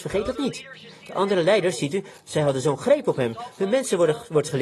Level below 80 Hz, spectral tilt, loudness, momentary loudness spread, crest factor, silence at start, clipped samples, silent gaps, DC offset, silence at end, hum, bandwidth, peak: -54 dBFS; -5 dB/octave; -23 LUFS; 10 LU; 18 dB; 0 s; under 0.1%; none; under 0.1%; 0 s; none; 12.5 kHz; -6 dBFS